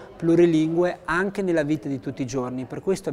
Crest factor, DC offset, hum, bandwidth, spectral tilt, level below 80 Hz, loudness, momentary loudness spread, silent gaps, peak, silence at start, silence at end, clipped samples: 16 dB; under 0.1%; none; 12 kHz; -6.5 dB/octave; -54 dBFS; -23 LUFS; 11 LU; none; -6 dBFS; 0 s; 0 s; under 0.1%